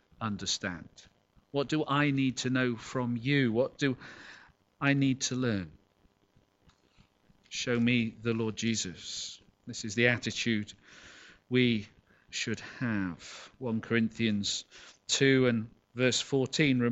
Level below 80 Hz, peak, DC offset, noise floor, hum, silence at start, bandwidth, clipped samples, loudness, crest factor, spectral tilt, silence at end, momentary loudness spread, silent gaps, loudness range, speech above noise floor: -64 dBFS; -8 dBFS; under 0.1%; -69 dBFS; none; 0.2 s; 8.2 kHz; under 0.1%; -30 LUFS; 22 dB; -4.5 dB/octave; 0 s; 18 LU; none; 4 LU; 38 dB